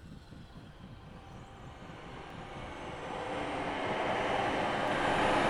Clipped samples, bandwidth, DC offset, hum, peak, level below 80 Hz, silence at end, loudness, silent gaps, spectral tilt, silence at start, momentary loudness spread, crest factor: under 0.1%; 13.5 kHz; under 0.1%; none; -18 dBFS; -54 dBFS; 0 s; -34 LUFS; none; -5 dB/octave; 0 s; 20 LU; 18 dB